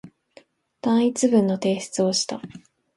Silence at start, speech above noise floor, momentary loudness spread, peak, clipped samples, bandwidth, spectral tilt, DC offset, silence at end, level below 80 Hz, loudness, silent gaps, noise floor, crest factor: 0.05 s; 33 dB; 11 LU; -6 dBFS; under 0.1%; 11.5 kHz; -4.5 dB/octave; under 0.1%; 0.4 s; -68 dBFS; -22 LUFS; none; -54 dBFS; 18 dB